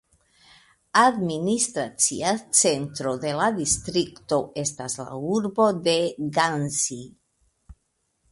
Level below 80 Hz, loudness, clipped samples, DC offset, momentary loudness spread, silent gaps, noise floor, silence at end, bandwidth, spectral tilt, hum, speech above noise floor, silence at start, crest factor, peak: -56 dBFS; -23 LUFS; under 0.1%; under 0.1%; 9 LU; none; -73 dBFS; 0.6 s; 12 kHz; -3 dB/octave; none; 49 dB; 0.95 s; 22 dB; -4 dBFS